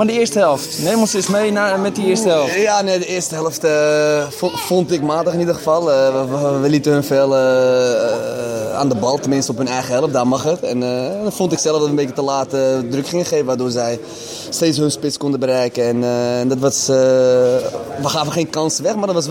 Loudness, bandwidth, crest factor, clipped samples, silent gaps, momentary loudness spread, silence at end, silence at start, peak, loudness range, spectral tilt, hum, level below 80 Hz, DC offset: -16 LUFS; 17 kHz; 14 dB; under 0.1%; none; 6 LU; 0 s; 0 s; -2 dBFS; 3 LU; -4.5 dB/octave; none; -58 dBFS; under 0.1%